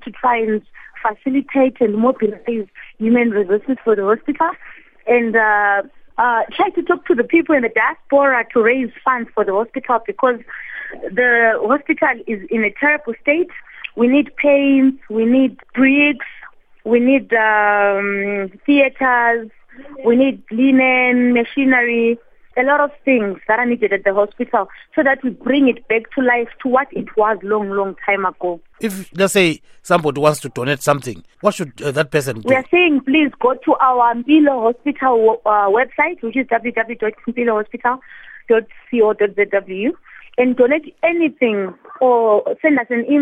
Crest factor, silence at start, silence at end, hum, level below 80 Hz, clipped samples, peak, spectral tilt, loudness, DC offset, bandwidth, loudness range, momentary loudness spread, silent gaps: 16 dB; 0.05 s; 0 s; none; -56 dBFS; under 0.1%; 0 dBFS; -5.5 dB/octave; -16 LUFS; under 0.1%; 14.5 kHz; 3 LU; 10 LU; none